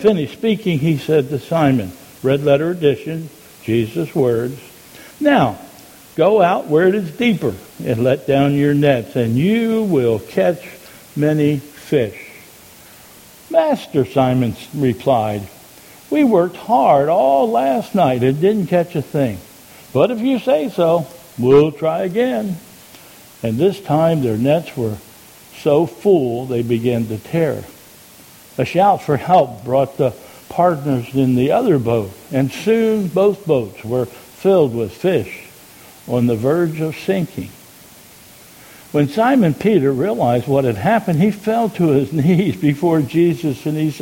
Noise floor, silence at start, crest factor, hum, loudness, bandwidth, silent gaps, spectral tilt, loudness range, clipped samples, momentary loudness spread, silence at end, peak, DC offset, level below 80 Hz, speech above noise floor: -43 dBFS; 0 s; 16 dB; none; -17 LUFS; 17 kHz; none; -7.5 dB/octave; 4 LU; under 0.1%; 9 LU; 0 s; 0 dBFS; under 0.1%; -52 dBFS; 27 dB